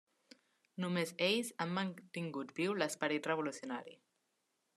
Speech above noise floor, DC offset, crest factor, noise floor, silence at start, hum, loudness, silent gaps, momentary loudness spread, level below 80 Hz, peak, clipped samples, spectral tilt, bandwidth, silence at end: 45 dB; under 0.1%; 22 dB; -83 dBFS; 0.75 s; none; -38 LUFS; none; 11 LU; -88 dBFS; -18 dBFS; under 0.1%; -4.5 dB/octave; 13.5 kHz; 0.8 s